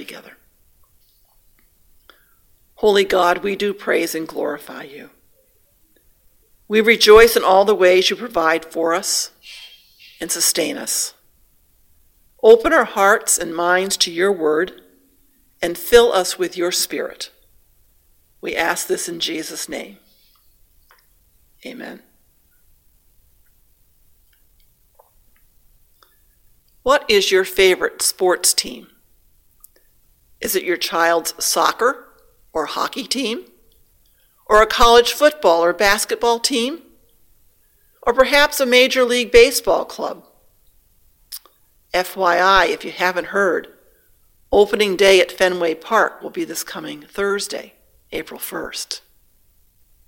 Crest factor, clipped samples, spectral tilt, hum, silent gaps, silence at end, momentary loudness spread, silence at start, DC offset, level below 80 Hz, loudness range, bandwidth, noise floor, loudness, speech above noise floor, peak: 20 dB; under 0.1%; -2 dB/octave; none; none; 1.1 s; 19 LU; 0 s; under 0.1%; -44 dBFS; 10 LU; 17 kHz; -58 dBFS; -16 LUFS; 41 dB; 0 dBFS